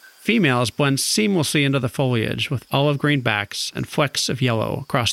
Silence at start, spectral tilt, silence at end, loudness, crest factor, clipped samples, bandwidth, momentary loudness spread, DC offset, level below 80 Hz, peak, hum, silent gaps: 0.25 s; -4.5 dB/octave; 0 s; -20 LUFS; 18 dB; under 0.1%; 16 kHz; 5 LU; under 0.1%; -54 dBFS; -2 dBFS; none; none